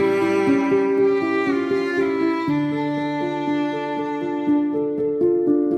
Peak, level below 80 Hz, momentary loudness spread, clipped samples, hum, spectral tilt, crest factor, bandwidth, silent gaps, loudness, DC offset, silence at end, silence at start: -8 dBFS; -62 dBFS; 6 LU; under 0.1%; none; -7 dB/octave; 12 dB; 8.8 kHz; none; -21 LUFS; under 0.1%; 0 s; 0 s